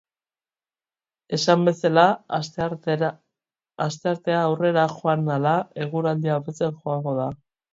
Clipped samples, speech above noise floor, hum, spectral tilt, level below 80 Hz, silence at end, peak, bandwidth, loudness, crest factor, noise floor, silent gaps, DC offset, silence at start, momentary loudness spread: under 0.1%; over 68 dB; none; -6 dB/octave; -66 dBFS; 0.4 s; -4 dBFS; 7.8 kHz; -23 LUFS; 20 dB; under -90 dBFS; none; under 0.1%; 1.3 s; 9 LU